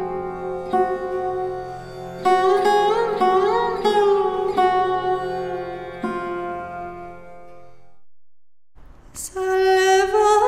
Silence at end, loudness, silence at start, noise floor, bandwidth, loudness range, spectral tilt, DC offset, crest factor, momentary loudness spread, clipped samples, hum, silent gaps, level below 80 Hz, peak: 0 s; -20 LUFS; 0 s; -56 dBFS; 15 kHz; 14 LU; -4 dB/octave; under 0.1%; 16 dB; 16 LU; under 0.1%; none; none; -50 dBFS; -4 dBFS